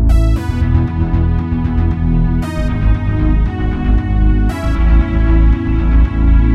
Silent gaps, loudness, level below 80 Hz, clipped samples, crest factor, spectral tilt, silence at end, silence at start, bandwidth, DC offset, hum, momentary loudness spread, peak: none; -15 LUFS; -14 dBFS; under 0.1%; 12 dB; -8.5 dB/octave; 0 s; 0 s; 5.2 kHz; under 0.1%; none; 4 LU; 0 dBFS